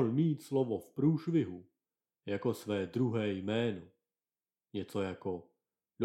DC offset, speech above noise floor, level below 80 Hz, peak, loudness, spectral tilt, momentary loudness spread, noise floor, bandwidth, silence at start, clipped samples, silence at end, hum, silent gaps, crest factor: under 0.1%; over 56 dB; -76 dBFS; -18 dBFS; -35 LUFS; -7.5 dB/octave; 12 LU; under -90 dBFS; 14.5 kHz; 0 s; under 0.1%; 0 s; none; none; 18 dB